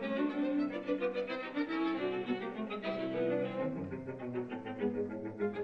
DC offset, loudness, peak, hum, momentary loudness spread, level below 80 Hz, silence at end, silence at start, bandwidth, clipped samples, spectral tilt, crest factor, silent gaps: under 0.1%; -37 LUFS; -22 dBFS; none; 6 LU; -72 dBFS; 0 s; 0 s; 6.4 kHz; under 0.1%; -8 dB/octave; 14 dB; none